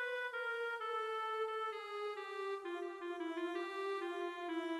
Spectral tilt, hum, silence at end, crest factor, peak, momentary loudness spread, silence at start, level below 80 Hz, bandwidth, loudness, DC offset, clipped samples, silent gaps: -2 dB/octave; none; 0 s; 12 dB; -30 dBFS; 4 LU; 0 s; -88 dBFS; 13.5 kHz; -42 LUFS; under 0.1%; under 0.1%; none